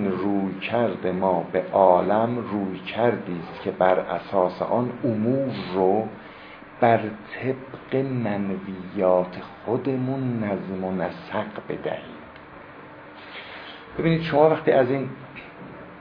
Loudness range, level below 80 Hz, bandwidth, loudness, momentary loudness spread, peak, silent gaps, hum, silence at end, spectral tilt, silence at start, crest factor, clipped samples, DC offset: 7 LU; -58 dBFS; 5.2 kHz; -24 LUFS; 21 LU; -4 dBFS; none; none; 0 s; -10 dB/octave; 0 s; 20 dB; under 0.1%; under 0.1%